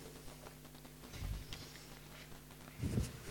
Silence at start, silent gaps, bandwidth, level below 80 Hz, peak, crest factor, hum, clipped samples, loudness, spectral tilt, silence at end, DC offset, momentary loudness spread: 0 s; none; 17.5 kHz; -52 dBFS; -22 dBFS; 24 dB; none; under 0.1%; -48 LUFS; -5 dB/octave; 0 s; under 0.1%; 14 LU